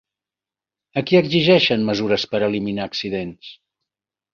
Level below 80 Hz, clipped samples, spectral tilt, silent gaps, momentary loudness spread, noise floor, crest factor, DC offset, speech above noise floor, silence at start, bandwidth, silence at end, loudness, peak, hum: -56 dBFS; under 0.1%; -6 dB/octave; none; 13 LU; -90 dBFS; 18 dB; under 0.1%; 71 dB; 0.95 s; 7 kHz; 0.8 s; -19 LUFS; -2 dBFS; none